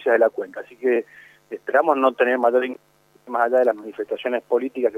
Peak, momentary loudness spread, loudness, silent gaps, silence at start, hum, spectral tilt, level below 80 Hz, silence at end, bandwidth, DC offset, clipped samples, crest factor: -4 dBFS; 15 LU; -21 LUFS; none; 0 s; none; -5.5 dB/octave; -76 dBFS; 0 s; 13 kHz; under 0.1%; under 0.1%; 18 dB